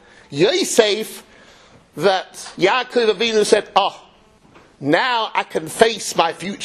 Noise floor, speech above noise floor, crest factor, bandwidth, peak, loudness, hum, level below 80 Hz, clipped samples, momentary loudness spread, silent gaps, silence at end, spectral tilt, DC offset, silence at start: -51 dBFS; 33 dB; 20 dB; 13.5 kHz; 0 dBFS; -18 LUFS; none; -58 dBFS; under 0.1%; 12 LU; none; 0 s; -3 dB/octave; under 0.1%; 0.3 s